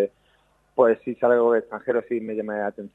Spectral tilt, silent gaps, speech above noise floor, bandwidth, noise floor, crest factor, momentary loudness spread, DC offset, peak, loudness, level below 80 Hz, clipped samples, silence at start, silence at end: -8.5 dB/octave; none; 41 dB; 3.9 kHz; -63 dBFS; 18 dB; 9 LU; under 0.1%; -6 dBFS; -23 LUFS; -70 dBFS; under 0.1%; 0 s; 0.05 s